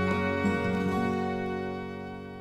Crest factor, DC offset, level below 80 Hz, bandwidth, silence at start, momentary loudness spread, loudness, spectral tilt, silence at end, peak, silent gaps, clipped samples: 14 dB; under 0.1%; -56 dBFS; 12.5 kHz; 0 s; 11 LU; -30 LUFS; -7 dB/octave; 0 s; -14 dBFS; none; under 0.1%